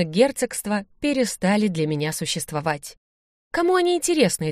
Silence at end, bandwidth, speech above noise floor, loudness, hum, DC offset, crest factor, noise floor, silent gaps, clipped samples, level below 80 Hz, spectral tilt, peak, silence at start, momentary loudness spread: 0 s; 15.5 kHz; over 68 dB; -22 LUFS; none; under 0.1%; 18 dB; under -90 dBFS; 2.97-3.51 s; under 0.1%; -56 dBFS; -4.5 dB/octave; -4 dBFS; 0 s; 8 LU